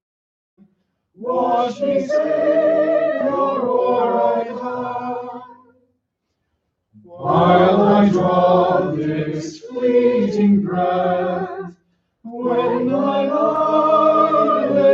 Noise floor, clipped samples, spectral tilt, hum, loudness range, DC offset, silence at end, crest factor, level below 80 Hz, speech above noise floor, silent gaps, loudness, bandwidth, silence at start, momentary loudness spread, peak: -74 dBFS; under 0.1%; -8 dB/octave; none; 6 LU; under 0.1%; 0 s; 16 dB; -60 dBFS; 57 dB; none; -17 LUFS; 7.4 kHz; 1.2 s; 13 LU; -2 dBFS